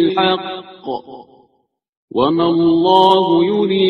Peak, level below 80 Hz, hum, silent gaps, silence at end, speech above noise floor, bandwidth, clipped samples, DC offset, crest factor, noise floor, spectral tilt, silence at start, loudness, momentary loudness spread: 0 dBFS; -54 dBFS; none; 1.89-2.08 s; 0 s; 51 dB; 5.8 kHz; under 0.1%; under 0.1%; 16 dB; -65 dBFS; -7.5 dB/octave; 0 s; -14 LUFS; 16 LU